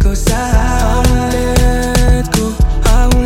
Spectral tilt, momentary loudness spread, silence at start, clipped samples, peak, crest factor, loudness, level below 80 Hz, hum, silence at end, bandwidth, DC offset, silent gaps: -5 dB/octave; 2 LU; 0 s; under 0.1%; 0 dBFS; 10 dB; -13 LUFS; -12 dBFS; none; 0 s; 16.5 kHz; under 0.1%; none